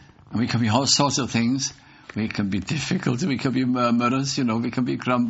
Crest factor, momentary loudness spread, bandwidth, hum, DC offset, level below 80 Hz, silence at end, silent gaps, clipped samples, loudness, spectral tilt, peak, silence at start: 18 dB; 9 LU; 8 kHz; none; under 0.1%; -56 dBFS; 0 s; none; under 0.1%; -23 LUFS; -4.5 dB/octave; -4 dBFS; 0.3 s